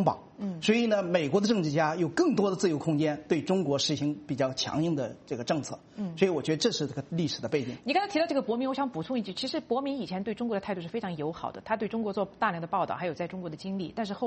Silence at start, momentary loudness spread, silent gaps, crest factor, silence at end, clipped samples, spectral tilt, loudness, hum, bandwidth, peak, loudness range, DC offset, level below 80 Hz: 0 s; 9 LU; none; 20 dB; 0 s; under 0.1%; -5.5 dB/octave; -30 LUFS; none; 8.4 kHz; -10 dBFS; 5 LU; under 0.1%; -66 dBFS